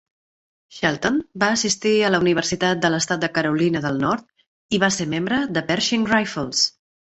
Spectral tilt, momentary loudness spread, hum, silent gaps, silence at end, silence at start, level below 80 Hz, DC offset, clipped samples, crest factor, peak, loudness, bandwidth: -3.5 dB/octave; 5 LU; none; 4.47-4.69 s; 0.5 s; 0.7 s; -56 dBFS; under 0.1%; under 0.1%; 20 dB; -2 dBFS; -20 LUFS; 8.4 kHz